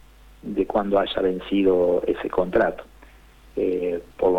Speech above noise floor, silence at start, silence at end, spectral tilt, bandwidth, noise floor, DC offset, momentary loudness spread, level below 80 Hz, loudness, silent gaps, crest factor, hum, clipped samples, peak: 27 dB; 0.45 s; 0 s; -7.5 dB/octave; 8.4 kHz; -49 dBFS; under 0.1%; 10 LU; -48 dBFS; -23 LUFS; none; 16 dB; none; under 0.1%; -8 dBFS